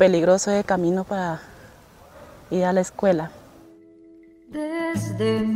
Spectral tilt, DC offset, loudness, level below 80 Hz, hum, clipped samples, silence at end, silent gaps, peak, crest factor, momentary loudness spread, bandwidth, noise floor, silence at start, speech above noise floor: -5.5 dB/octave; under 0.1%; -23 LUFS; -56 dBFS; none; under 0.1%; 0 s; none; -2 dBFS; 20 dB; 12 LU; 15.5 kHz; -49 dBFS; 0 s; 28 dB